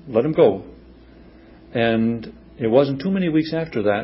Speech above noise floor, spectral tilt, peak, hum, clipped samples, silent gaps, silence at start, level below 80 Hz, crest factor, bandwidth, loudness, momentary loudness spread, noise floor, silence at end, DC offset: 27 dB; -11.5 dB/octave; -2 dBFS; none; under 0.1%; none; 0.05 s; -50 dBFS; 18 dB; 5.8 kHz; -20 LUFS; 12 LU; -46 dBFS; 0 s; under 0.1%